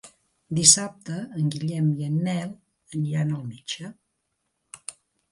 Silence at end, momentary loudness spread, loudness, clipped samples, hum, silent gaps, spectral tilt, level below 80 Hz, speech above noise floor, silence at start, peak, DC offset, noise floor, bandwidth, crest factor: 0.4 s; 24 LU; -23 LUFS; under 0.1%; none; none; -3.5 dB/octave; -66 dBFS; 52 dB; 0.05 s; -2 dBFS; under 0.1%; -77 dBFS; 11.5 kHz; 26 dB